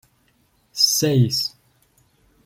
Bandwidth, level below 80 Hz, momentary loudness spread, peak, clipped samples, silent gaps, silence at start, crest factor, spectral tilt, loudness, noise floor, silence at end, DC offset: 16.5 kHz; -58 dBFS; 12 LU; -4 dBFS; under 0.1%; none; 0.75 s; 20 dB; -4 dB/octave; -18 LUFS; -62 dBFS; 0.95 s; under 0.1%